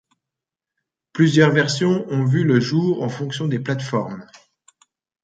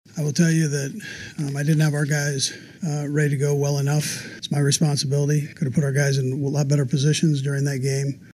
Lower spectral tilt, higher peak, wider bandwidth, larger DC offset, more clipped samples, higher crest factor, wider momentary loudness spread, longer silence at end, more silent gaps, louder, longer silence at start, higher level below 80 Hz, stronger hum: about the same, -6.5 dB/octave vs -5.5 dB/octave; first, -2 dBFS vs -6 dBFS; second, 9 kHz vs 14.5 kHz; neither; neither; about the same, 18 dB vs 16 dB; about the same, 10 LU vs 8 LU; first, 1 s vs 0.1 s; neither; first, -19 LUFS vs -22 LUFS; first, 1.15 s vs 0.15 s; about the same, -62 dBFS vs -62 dBFS; neither